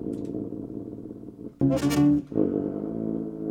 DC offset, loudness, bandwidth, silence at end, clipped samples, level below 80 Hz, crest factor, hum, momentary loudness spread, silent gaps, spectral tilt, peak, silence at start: under 0.1%; -27 LUFS; 16 kHz; 0 s; under 0.1%; -52 dBFS; 16 dB; none; 18 LU; none; -7.5 dB/octave; -10 dBFS; 0 s